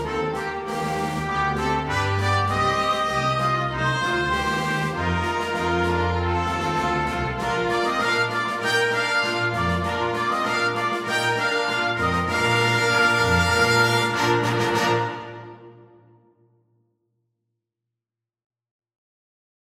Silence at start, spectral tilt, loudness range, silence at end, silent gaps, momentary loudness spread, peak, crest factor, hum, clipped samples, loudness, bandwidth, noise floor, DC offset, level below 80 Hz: 0 s; -4.5 dB/octave; 4 LU; 4 s; none; 7 LU; -6 dBFS; 16 dB; none; under 0.1%; -22 LUFS; 16 kHz; -88 dBFS; under 0.1%; -44 dBFS